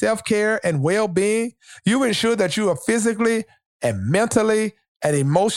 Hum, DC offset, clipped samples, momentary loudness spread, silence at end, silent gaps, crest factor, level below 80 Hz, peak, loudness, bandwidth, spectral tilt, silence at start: none; under 0.1%; under 0.1%; 7 LU; 0 s; 3.66-3.80 s, 4.88-5.00 s; 16 dB; -58 dBFS; -4 dBFS; -20 LUFS; 16 kHz; -5 dB/octave; 0 s